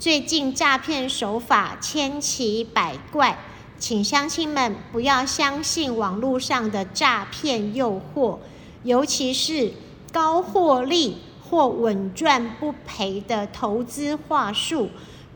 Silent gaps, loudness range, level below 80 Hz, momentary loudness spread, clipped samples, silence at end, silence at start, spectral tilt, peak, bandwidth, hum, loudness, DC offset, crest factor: none; 2 LU; -54 dBFS; 8 LU; under 0.1%; 0 s; 0 s; -3 dB/octave; -4 dBFS; over 20 kHz; none; -22 LUFS; under 0.1%; 18 dB